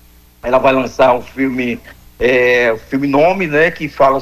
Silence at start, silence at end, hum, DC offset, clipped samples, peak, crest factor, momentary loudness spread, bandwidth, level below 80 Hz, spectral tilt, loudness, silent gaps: 0.45 s; 0 s; none; under 0.1%; under 0.1%; 0 dBFS; 14 dB; 8 LU; 14.5 kHz; -42 dBFS; -6 dB/octave; -14 LUFS; none